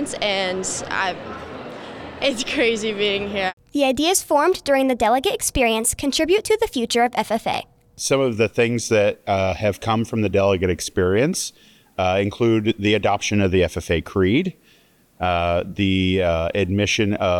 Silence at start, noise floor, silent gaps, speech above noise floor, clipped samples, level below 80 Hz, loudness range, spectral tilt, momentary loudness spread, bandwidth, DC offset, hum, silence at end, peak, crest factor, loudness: 0 s; -56 dBFS; 3.53-3.57 s; 36 dB; under 0.1%; -46 dBFS; 3 LU; -4 dB/octave; 7 LU; 19 kHz; under 0.1%; none; 0 s; -6 dBFS; 14 dB; -20 LUFS